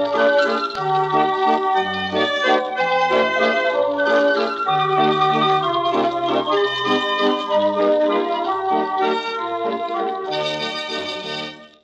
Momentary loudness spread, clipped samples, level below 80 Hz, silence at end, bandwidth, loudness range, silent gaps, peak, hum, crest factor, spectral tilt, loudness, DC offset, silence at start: 7 LU; under 0.1%; -62 dBFS; 0.15 s; 8.4 kHz; 4 LU; none; -4 dBFS; none; 14 dB; -4.5 dB/octave; -19 LUFS; under 0.1%; 0 s